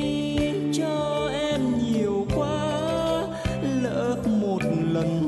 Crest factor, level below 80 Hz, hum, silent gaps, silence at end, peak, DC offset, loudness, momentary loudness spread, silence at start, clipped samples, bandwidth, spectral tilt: 12 dB; -44 dBFS; none; none; 0 s; -12 dBFS; under 0.1%; -25 LUFS; 2 LU; 0 s; under 0.1%; 12 kHz; -6.5 dB/octave